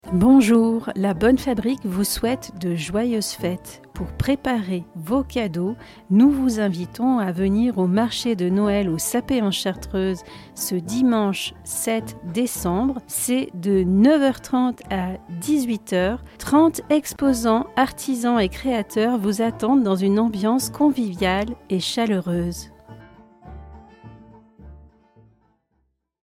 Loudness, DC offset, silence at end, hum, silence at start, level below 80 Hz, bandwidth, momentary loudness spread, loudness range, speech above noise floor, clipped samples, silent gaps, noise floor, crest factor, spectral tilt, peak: -21 LUFS; under 0.1%; 1.45 s; none; 0.05 s; -44 dBFS; 16.5 kHz; 10 LU; 4 LU; 49 dB; under 0.1%; none; -70 dBFS; 16 dB; -5.5 dB/octave; -6 dBFS